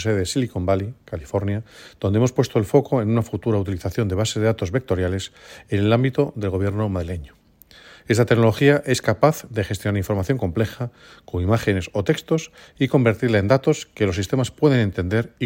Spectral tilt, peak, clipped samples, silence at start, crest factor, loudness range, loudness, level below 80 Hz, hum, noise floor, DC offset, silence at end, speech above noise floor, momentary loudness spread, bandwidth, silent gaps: -6.5 dB/octave; 0 dBFS; under 0.1%; 0 s; 20 dB; 3 LU; -21 LUFS; -50 dBFS; none; -49 dBFS; under 0.1%; 0 s; 28 dB; 9 LU; 16.5 kHz; none